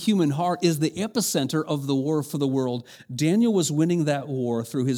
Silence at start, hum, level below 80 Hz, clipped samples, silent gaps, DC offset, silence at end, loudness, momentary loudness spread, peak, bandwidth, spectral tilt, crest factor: 0 s; none; -68 dBFS; under 0.1%; none; under 0.1%; 0 s; -24 LUFS; 5 LU; -8 dBFS; over 20 kHz; -5.5 dB/octave; 16 dB